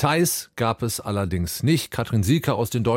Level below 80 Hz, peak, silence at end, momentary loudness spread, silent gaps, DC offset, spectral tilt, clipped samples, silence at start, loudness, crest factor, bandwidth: -50 dBFS; -6 dBFS; 0 s; 5 LU; none; under 0.1%; -5 dB/octave; under 0.1%; 0 s; -23 LUFS; 16 dB; 17 kHz